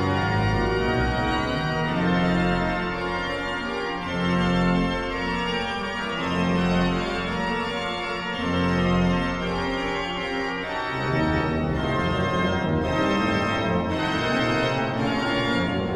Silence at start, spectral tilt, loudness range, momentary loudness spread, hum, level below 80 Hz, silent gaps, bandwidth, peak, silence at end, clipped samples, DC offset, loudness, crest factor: 0 s; -6 dB/octave; 2 LU; 5 LU; none; -38 dBFS; none; 10 kHz; -10 dBFS; 0 s; under 0.1%; under 0.1%; -24 LUFS; 14 dB